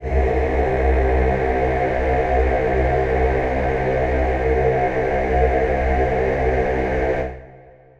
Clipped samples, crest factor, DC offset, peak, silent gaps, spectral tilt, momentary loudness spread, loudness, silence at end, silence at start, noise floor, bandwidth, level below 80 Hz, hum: under 0.1%; 14 dB; under 0.1%; -4 dBFS; none; -8.5 dB/octave; 2 LU; -19 LUFS; 0.3 s; 0 s; -45 dBFS; 6.8 kHz; -24 dBFS; none